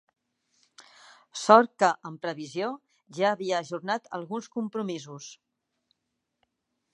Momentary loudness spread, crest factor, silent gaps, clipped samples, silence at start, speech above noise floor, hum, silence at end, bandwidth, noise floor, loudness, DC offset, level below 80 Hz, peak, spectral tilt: 23 LU; 26 dB; none; under 0.1%; 0.8 s; 55 dB; none; 1.6 s; 11 kHz; -82 dBFS; -27 LUFS; under 0.1%; -78 dBFS; -2 dBFS; -4.5 dB/octave